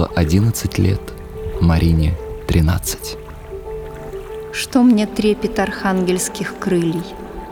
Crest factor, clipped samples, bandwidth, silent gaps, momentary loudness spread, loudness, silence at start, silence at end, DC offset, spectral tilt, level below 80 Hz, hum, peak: 16 dB; under 0.1%; over 20 kHz; none; 16 LU; -18 LUFS; 0 s; 0 s; under 0.1%; -6 dB/octave; -30 dBFS; none; -2 dBFS